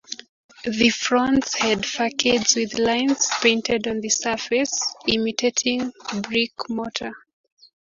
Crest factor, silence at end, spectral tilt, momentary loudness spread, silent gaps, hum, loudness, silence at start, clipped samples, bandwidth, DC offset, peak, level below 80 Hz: 20 dB; 0.65 s; -2 dB/octave; 10 LU; 0.29-0.49 s; none; -21 LUFS; 0.1 s; under 0.1%; 7.6 kHz; under 0.1%; -2 dBFS; -54 dBFS